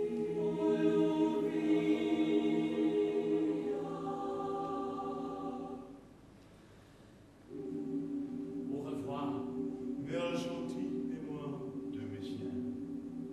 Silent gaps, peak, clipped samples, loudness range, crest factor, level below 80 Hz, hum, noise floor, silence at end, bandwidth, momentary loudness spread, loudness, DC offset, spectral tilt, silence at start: none; -20 dBFS; under 0.1%; 12 LU; 16 dB; -68 dBFS; none; -58 dBFS; 0 s; 11 kHz; 11 LU; -36 LUFS; under 0.1%; -7 dB/octave; 0 s